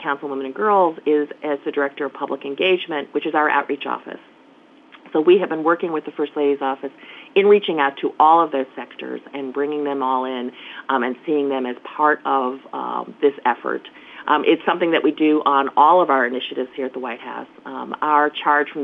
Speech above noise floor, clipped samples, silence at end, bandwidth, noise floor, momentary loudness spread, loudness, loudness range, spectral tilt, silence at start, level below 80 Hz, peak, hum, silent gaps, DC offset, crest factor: 30 dB; under 0.1%; 0 s; 4.1 kHz; -49 dBFS; 15 LU; -20 LUFS; 5 LU; -7.5 dB/octave; 0 s; -78 dBFS; -2 dBFS; none; none; under 0.1%; 18 dB